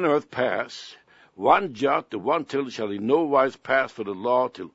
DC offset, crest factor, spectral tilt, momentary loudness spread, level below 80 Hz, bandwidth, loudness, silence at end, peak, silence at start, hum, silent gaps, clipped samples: under 0.1%; 20 dB; -5.5 dB/octave; 9 LU; -68 dBFS; 8 kHz; -24 LUFS; 0.05 s; -4 dBFS; 0 s; none; none; under 0.1%